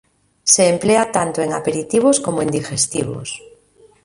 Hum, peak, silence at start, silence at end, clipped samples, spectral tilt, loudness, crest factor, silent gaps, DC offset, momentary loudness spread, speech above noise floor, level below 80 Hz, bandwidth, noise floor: none; 0 dBFS; 0.45 s; 0.65 s; under 0.1%; -3.5 dB/octave; -17 LUFS; 18 dB; none; under 0.1%; 12 LU; 34 dB; -54 dBFS; 11.5 kHz; -51 dBFS